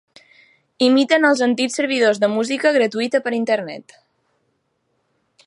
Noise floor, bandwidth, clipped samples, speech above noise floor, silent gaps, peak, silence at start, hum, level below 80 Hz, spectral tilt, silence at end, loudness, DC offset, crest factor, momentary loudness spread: -69 dBFS; 11 kHz; under 0.1%; 52 dB; none; -2 dBFS; 0.8 s; none; -76 dBFS; -3.5 dB/octave; 1.65 s; -17 LUFS; under 0.1%; 18 dB; 7 LU